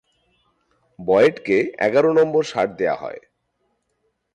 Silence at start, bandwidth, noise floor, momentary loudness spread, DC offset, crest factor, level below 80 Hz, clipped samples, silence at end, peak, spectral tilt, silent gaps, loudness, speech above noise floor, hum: 1 s; 9 kHz; -71 dBFS; 14 LU; under 0.1%; 16 dB; -62 dBFS; under 0.1%; 1.15 s; -6 dBFS; -6 dB/octave; none; -19 LUFS; 53 dB; 60 Hz at -60 dBFS